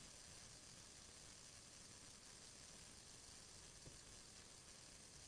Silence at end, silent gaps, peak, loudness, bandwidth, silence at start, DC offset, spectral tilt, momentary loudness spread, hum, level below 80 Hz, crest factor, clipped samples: 0 s; none; -48 dBFS; -59 LUFS; 11 kHz; 0 s; under 0.1%; -1.5 dB/octave; 1 LU; none; -74 dBFS; 14 dB; under 0.1%